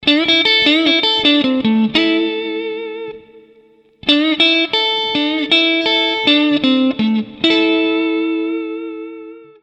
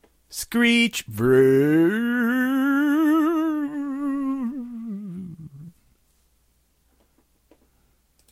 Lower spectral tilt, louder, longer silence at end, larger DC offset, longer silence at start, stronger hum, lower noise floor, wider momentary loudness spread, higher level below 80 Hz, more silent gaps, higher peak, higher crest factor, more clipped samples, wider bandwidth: about the same, -4.5 dB/octave vs -5.5 dB/octave; first, -13 LUFS vs -21 LUFS; second, 0.2 s vs 2.6 s; neither; second, 0 s vs 0.3 s; neither; second, -50 dBFS vs -65 dBFS; second, 14 LU vs 18 LU; about the same, -56 dBFS vs -58 dBFS; neither; first, 0 dBFS vs -6 dBFS; about the same, 16 dB vs 16 dB; neither; second, 8.6 kHz vs 16 kHz